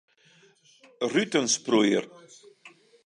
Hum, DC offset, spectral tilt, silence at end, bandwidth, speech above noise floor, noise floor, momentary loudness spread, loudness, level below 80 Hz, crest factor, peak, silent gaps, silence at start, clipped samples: none; under 0.1%; -3 dB/octave; 0.4 s; 11.5 kHz; 35 dB; -60 dBFS; 9 LU; -25 LUFS; -80 dBFS; 20 dB; -8 dBFS; none; 1 s; under 0.1%